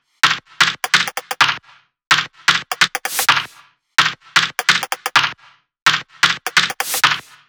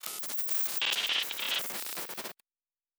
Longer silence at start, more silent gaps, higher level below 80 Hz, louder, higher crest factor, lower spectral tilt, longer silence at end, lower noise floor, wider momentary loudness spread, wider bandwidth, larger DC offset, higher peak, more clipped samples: first, 0.25 s vs 0.05 s; first, 5.82-5.86 s vs none; first, -62 dBFS vs -86 dBFS; first, -16 LUFS vs -30 LUFS; second, 18 dB vs 24 dB; first, 0 dB/octave vs 1.5 dB/octave; second, 0.3 s vs 0.65 s; second, -51 dBFS vs under -90 dBFS; second, 3 LU vs 10 LU; about the same, over 20 kHz vs over 20 kHz; neither; first, 0 dBFS vs -10 dBFS; neither